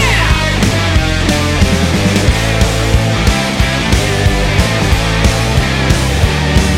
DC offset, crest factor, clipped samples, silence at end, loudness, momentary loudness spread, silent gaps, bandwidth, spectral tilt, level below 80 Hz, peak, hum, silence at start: under 0.1%; 12 dB; under 0.1%; 0 s; -12 LUFS; 1 LU; none; 16.5 kHz; -4.5 dB/octave; -16 dBFS; 0 dBFS; none; 0 s